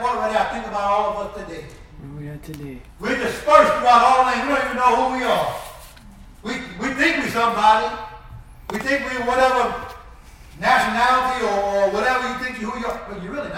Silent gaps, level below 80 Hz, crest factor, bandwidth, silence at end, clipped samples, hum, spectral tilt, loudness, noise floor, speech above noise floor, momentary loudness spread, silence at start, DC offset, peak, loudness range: none; -44 dBFS; 20 dB; 17 kHz; 0 s; under 0.1%; none; -4 dB/octave; -19 LUFS; -43 dBFS; 23 dB; 20 LU; 0 s; under 0.1%; 0 dBFS; 4 LU